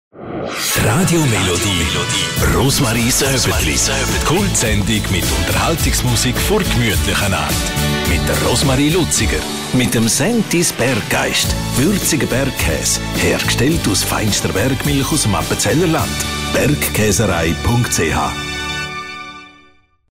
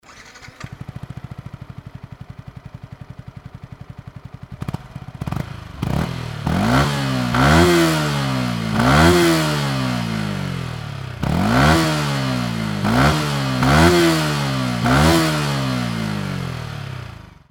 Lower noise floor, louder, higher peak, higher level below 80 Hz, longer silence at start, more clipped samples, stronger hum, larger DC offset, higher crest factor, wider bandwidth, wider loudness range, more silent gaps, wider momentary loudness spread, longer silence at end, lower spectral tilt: first, -51 dBFS vs -41 dBFS; first, -15 LUFS vs -18 LUFS; second, -4 dBFS vs 0 dBFS; first, -28 dBFS vs -34 dBFS; about the same, 0.15 s vs 0.1 s; neither; neither; neither; second, 12 dB vs 18 dB; second, 16 kHz vs 18 kHz; second, 1 LU vs 20 LU; neither; second, 5 LU vs 24 LU; first, 0.65 s vs 0.25 s; second, -3.5 dB/octave vs -5.5 dB/octave